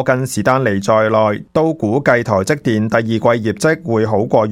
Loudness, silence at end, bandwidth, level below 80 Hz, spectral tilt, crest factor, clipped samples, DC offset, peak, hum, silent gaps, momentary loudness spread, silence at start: -15 LUFS; 0 s; 16 kHz; -52 dBFS; -6 dB/octave; 14 dB; under 0.1%; under 0.1%; 0 dBFS; none; none; 3 LU; 0 s